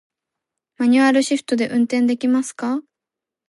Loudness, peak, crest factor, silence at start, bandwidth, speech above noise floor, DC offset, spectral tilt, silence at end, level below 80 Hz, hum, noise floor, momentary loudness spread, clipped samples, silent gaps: -19 LUFS; -4 dBFS; 16 dB; 0.8 s; 11.5 kHz; 69 dB; under 0.1%; -4 dB/octave; 0.65 s; -70 dBFS; none; -86 dBFS; 10 LU; under 0.1%; none